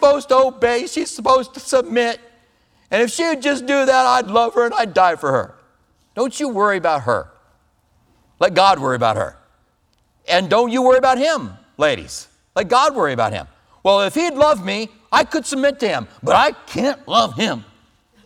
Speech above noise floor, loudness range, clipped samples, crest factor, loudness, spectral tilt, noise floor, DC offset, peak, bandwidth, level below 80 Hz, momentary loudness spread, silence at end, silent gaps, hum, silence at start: 45 dB; 3 LU; under 0.1%; 18 dB; -17 LUFS; -4 dB/octave; -62 dBFS; under 0.1%; 0 dBFS; 15 kHz; -54 dBFS; 10 LU; 0.65 s; none; none; 0 s